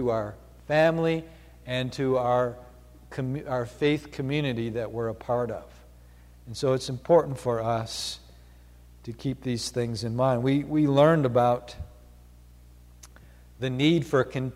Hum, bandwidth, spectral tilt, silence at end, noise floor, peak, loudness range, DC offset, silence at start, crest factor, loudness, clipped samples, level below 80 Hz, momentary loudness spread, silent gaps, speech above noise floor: 60 Hz at -50 dBFS; 15.5 kHz; -6 dB/octave; 0 s; -51 dBFS; -8 dBFS; 5 LU; under 0.1%; 0 s; 20 dB; -26 LUFS; under 0.1%; -52 dBFS; 17 LU; none; 25 dB